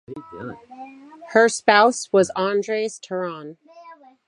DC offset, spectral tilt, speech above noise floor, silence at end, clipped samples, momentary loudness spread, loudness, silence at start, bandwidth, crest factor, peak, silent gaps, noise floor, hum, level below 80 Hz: under 0.1%; -3.5 dB/octave; 26 dB; 0.35 s; under 0.1%; 25 LU; -19 LUFS; 0.1 s; 11.5 kHz; 20 dB; -2 dBFS; none; -46 dBFS; none; -68 dBFS